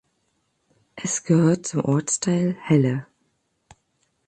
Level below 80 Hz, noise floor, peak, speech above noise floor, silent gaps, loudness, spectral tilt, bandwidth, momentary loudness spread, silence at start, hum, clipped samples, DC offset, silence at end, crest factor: -62 dBFS; -71 dBFS; -6 dBFS; 50 dB; none; -22 LUFS; -6 dB/octave; 9.8 kHz; 8 LU; 0.95 s; none; under 0.1%; under 0.1%; 1.25 s; 18 dB